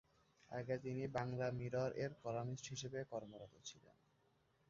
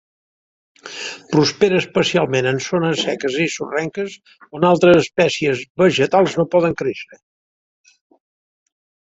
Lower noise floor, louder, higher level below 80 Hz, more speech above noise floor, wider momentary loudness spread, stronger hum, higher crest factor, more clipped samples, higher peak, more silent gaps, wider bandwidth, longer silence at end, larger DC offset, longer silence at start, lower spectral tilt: second, -78 dBFS vs under -90 dBFS; second, -46 LUFS vs -17 LUFS; second, -74 dBFS vs -56 dBFS; second, 33 dB vs over 73 dB; about the same, 13 LU vs 15 LU; neither; about the same, 20 dB vs 18 dB; neither; second, -26 dBFS vs -2 dBFS; second, none vs 5.70-5.75 s; about the same, 7.6 kHz vs 8 kHz; second, 0.9 s vs 2 s; neither; second, 0.5 s vs 0.85 s; about the same, -6 dB/octave vs -5 dB/octave